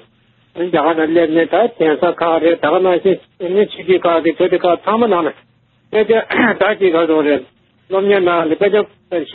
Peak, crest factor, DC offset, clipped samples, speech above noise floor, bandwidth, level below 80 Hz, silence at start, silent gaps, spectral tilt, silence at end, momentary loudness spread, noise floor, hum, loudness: 0 dBFS; 14 dB; under 0.1%; under 0.1%; 41 dB; 4.4 kHz; -58 dBFS; 0.55 s; none; -3.5 dB/octave; 0 s; 7 LU; -54 dBFS; none; -14 LUFS